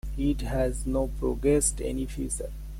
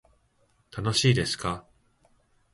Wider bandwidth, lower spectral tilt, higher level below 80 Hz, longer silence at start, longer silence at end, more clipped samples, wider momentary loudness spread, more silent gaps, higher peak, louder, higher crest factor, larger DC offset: first, 16 kHz vs 11.5 kHz; about the same, -5.5 dB/octave vs -4.5 dB/octave; first, -34 dBFS vs -52 dBFS; second, 0.05 s vs 0.75 s; second, 0 s vs 0.95 s; neither; second, 9 LU vs 16 LU; neither; second, -12 dBFS vs -8 dBFS; about the same, -28 LUFS vs -26 LUFS; about the same, 16 dB vs 20 dB; neither